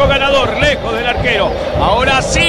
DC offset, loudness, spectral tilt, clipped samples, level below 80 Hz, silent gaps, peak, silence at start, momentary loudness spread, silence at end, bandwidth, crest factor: under 0.1%; -13 LUFS; -4 dB/octave; under 0.1%; -24 dBFS; none; 0 dBFS; 0 s; 5 LU; 0 s; 13.5 kHz; 12 dB